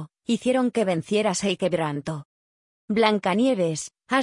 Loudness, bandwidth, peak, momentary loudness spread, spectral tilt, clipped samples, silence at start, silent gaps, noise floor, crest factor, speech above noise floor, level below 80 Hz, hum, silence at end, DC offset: -24 LUFS; 11 kHz; -6 dBFS; 9 LU; -5 dB/octave; under 0.1%; 0 s; 2.25-2.88 s; under -90 dBFS; 18 dB; over 67 dB; -64 dBFS; none; 0 s; under 0.1%